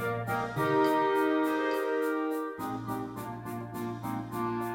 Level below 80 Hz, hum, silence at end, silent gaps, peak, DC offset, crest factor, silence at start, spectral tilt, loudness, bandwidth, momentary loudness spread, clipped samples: -64 dBFS; none; 0 s; none; -16 dBFS; under 0.1%; 14 dB; 0 s; -6.5 dB/octave; -31 LUFS; 18 kHz; 12 LU; under 0.1%